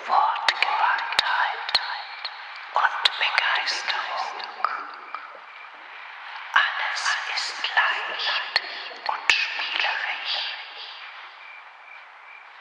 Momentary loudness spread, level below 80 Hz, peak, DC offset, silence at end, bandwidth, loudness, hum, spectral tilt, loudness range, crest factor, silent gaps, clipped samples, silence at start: 20 LU; -74 dBFS; 0 dBFS; under 0.1%; 0 s; 11.5 kHz; -24 LUFS; none; 2 dB/octave; 5 LU; 26 dB; none; under 0.1%; 0 s